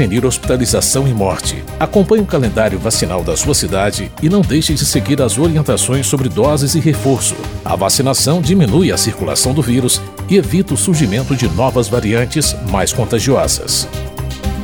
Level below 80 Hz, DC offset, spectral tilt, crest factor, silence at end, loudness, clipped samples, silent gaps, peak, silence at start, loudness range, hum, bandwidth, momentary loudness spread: -28 dBFS; 0.4%; -4.5 dB/octave; 14 dB; 0 s; -14 LUFS; under 0.1%; none; 0 dBFS; 0 s; 1 LU; none; 19.5 kHz; 4 LU